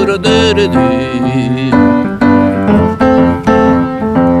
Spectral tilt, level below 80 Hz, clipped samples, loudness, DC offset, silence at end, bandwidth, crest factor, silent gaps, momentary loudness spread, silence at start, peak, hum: -6.5 dB/octave; -32 dBFS; under 0.1%; -10 LUFS; under 0.1%; 0 s; 10.5 kHz; 10 dB; none; 4 LU; 0 s; 0 dBFS; none